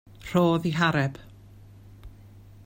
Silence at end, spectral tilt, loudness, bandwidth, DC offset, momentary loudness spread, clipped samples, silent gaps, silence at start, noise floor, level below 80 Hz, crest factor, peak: 0.25 s; -6.5 dB/octave; -25 LUFS; 16 kHz; under 0.1%; 8 LU; under 0.1%; none; 0.25 s; -49 dBFS; -52 dBFS; 18 dB; -10 dBFS